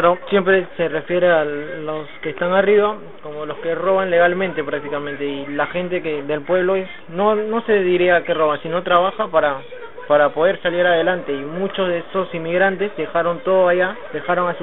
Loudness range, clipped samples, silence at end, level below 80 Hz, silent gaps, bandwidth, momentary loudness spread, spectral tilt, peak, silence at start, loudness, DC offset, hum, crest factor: 3 LU; under 0.1%; 0 s; -56 dBFS; none; 4.1 kHz; 11 LU; -9.5 dB/octave; 0 dBFS; 0 s; -19 LUFS; 1%; none; 18 dB